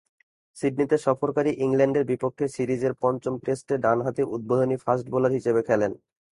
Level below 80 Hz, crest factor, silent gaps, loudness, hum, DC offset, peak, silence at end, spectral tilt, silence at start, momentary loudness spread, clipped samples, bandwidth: -62 dBFS; 18 dB; none; -25 LUFS; none; under 0.1%; -6 dBFS; 0.35 s; -7.5 dB/octave; 0.55 s; 6 LU; under 0.1%; 11.5 kHz